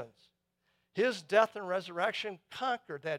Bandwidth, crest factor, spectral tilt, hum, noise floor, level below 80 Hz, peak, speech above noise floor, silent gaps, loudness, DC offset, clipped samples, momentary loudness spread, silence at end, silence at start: 14 kHz; 22 dB; -4 dB/octave; none; -79 dBFS; -82 dBFS; -12 dBFS; 46 dB; none; -33 LUFS; under 0.1%; under 0.1%; 12 LU; 0 s; 0 s